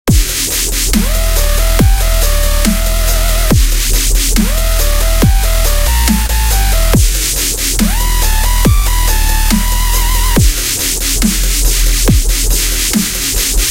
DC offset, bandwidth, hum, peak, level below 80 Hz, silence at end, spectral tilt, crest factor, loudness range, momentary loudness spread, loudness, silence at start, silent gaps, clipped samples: under 0.1%; 17 kHz; none; 0 dBFS; -12 dBFS; 0 s; -3.5 dB/octave; 10 dB; 1 LU; 2 LU; -12 LUFS; 0.05 s; none; under 0.1%